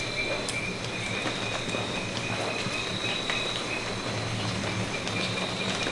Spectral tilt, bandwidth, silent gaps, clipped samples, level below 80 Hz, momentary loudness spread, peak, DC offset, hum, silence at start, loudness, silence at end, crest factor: -3.5 dB/octave; 11.5 kHz; none; under 0.1%; -50 dBFS; 2 LU; -10 dBFS; under 0.1%; none; 0 s; -29 LUFS; 0 s; 20 dB